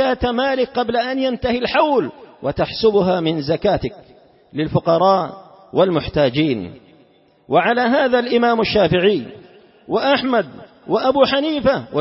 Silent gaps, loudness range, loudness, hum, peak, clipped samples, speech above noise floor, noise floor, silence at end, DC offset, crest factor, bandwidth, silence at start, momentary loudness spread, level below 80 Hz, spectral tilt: none; 2 LU; -17 LUFS; none; -2 dBFS; under 0.1%; 36 dB; -53 dBFS; 0 s; under 0.1%; 16 dB; 5.8 kHz; 0 s; 10 LU; -44 dBFS; -9.5 dB/octave